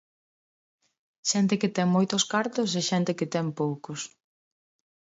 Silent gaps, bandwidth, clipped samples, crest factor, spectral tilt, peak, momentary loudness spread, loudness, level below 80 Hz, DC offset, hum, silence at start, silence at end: none; 8 kHz; under 0.1%; 18 dB; -4.5 dB/octave; -12 dBFS; 11 LU; -26 LUFS; -74 dBFS; under 0.1%; none; 1.25 s; 1 s